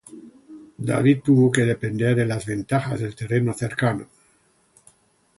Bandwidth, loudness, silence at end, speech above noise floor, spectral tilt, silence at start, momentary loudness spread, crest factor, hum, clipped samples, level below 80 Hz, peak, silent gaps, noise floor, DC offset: 11.5 kHz; -22 LUFS; 1.35 s; 41 dB; -7 dB/octave; 0.1 s; 11 LU; 18 dB; none; under 0.1%; -56 dBFS; -4 dBFS; none; -62 dBFS; under 0.1%